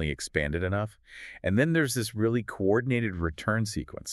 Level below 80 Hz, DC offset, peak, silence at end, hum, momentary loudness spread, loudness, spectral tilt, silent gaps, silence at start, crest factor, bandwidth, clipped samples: -46 dBFS; under 0.1%; -8 dBFS; 0 s; none; 10 LU; -28 LUFS; -5.5 dB/octave; none; 0 s; 20 dB; 13 kHz; under 0.1%